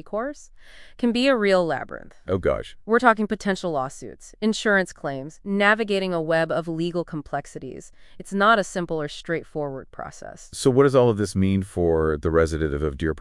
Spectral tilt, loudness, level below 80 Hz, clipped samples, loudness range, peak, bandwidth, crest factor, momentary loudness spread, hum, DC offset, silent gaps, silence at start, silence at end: -5.5 dB/octave; -23 LUFS; -44 dBFS; under 0.1%; 4 LU; -2 dBFS; 12 kHz; 22 dB; 18 LU; none; under 0.1%; none; 0.05 s; 0 s